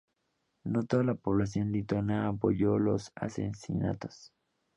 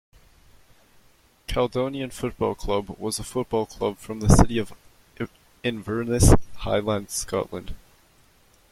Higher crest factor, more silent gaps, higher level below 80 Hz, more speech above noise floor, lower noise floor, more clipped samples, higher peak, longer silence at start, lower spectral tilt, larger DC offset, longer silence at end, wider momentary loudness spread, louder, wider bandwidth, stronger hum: second, 18 dB vs 24 dB; neither; second, -56 dBFS vs -32 dBFS; first, 49 dB vs 35 dB; first, -79 dBFS vs -58 dBFS; neither; second, -14 dBFS vs 0 dBFS; second, 0.65 s vs 1.5 s; first, -8 dB/octave vs -5.5 dB/octave; neither; second, 0.5 s vs 0.95 s; second, 10 LU vs 17 LU; second, -31 LUFS vs -25 LUFS; second, 10.5 kHz vs 15.5 kHz; neither